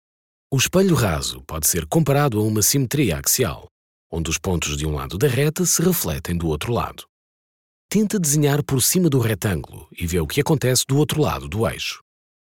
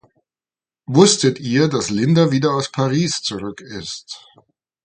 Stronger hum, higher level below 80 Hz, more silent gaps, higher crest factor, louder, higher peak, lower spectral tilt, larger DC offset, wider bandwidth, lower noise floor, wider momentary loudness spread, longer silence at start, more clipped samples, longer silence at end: neither; first, -38 dBFS vs -56 dBFS; first, 3.71-4.10 s, 7.09-7.89 s vs none; about the same, 16 dB vs 18 dB; second, -20 LUFS vs -17 LUFS; second, -6 dBFS vs 0 dBFS; about the same, -4.5 dB/octave vs -5 dB/octave; first, 0.1% vs under 0.1%; first, 17 kHz vs 9.4 kHz; about the same, under -90 dBFS vs under -90 dBFS; second, 9 LU vs 17 LU; second, 0.5 s vs 0.9 s; neither; second, 0.5 s vs 0.7 s